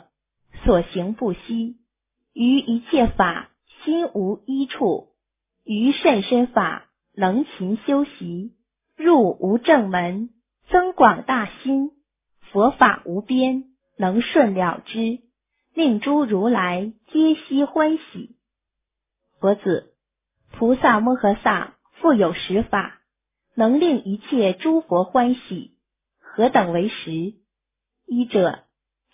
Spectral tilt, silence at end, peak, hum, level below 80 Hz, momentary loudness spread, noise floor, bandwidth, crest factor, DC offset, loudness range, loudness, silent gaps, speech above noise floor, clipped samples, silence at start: -10 dB/octave; 0.55 s; 0 dBFS; none; -44 dBFS; 12 LU; -84 dBFS; 3.8 kHz; 20 dB; under 0.1%; 4 LU; -20 LUFS; none; 64 dB; under 0.1%; 0.55 s